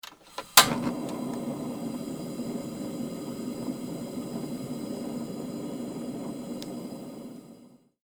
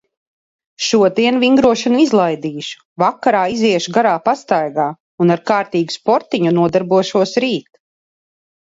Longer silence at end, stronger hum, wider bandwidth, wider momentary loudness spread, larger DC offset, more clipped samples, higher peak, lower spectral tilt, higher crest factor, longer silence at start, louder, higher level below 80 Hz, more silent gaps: second, 0.3 s vs 1.05 s; neither; first, over 20 kHz vs 8 kHz; first, 16 LU vs 8 LU; neither; neither; about the same, 0 dBFS vs 0 dBFS; second, -2.5 dB/octave vs -5 dB/octave; first, 32 dB vs 16 dB; second, 0.05 s vs 0.8 s; second, -30 LUFS vs -15 LUFS; second, -64 dBFS vs -56 dBFS; second, none vs 2.85-2.96 s, 5.00-5.18 s